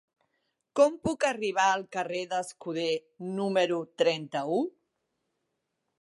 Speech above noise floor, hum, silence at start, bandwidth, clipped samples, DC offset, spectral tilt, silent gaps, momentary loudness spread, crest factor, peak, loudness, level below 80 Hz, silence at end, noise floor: 53 dB; none; 0.75 s; 11.5 kHz; under 0.1%; under 0.1%; -4 dB/octave; none; 9 LU; 20 dB; -10 dBFS; -29 LUFS; -68 dBFS; 1.3 s; -81 dBFS